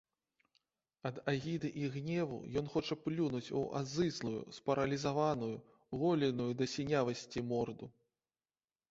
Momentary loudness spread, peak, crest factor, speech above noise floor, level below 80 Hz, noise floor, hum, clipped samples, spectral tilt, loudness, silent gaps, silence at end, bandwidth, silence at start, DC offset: 8 LU; -20 dBFS; 18 dB; over 53 dB; -68 dBFS; under -90 dBFS; none; under 0.1%; -5.5 dB/octave; -38 LUFS; none; 1 s; 8 kHz; 1.05 s; under 0.1%